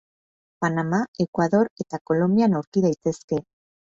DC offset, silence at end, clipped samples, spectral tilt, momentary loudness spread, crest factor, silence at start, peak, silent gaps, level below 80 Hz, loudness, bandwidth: under 0.1%; 0.55 s; under 0.1%; -7.5 dB/octave; 9 LU; 16 dB; 0.6 s; -6 dBFS; 1.08-1.14 s, 1.28-1.33 s, 1.71-1.76 s, 2.01-2.05 s, 2.67-2.72 s, 3.24-3.28 s; -62 dBFS; -23 LUFS; 7.8 kHz